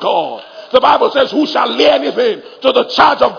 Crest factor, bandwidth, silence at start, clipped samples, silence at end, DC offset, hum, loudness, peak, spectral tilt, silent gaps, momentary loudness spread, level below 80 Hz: 12 dB; 5.4 kHz; 0 s; 0.4%; 0 s; under 0.1%; none; -12 LUFS; 0 dBFS; -4 dB/octave; none; 7 LU; -52 dBFS